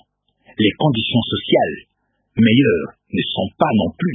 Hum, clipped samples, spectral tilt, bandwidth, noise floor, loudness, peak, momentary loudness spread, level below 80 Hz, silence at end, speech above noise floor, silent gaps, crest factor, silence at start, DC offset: none; under 0.1%; -10 dB/octave; 3.9 kHz; -55 dBFS; -18 LUFS; 0 dBFS; 10 LU; -48 dBFS; 0 s; 38 dB; none; 18 dB; 0.6 s; under 0.1%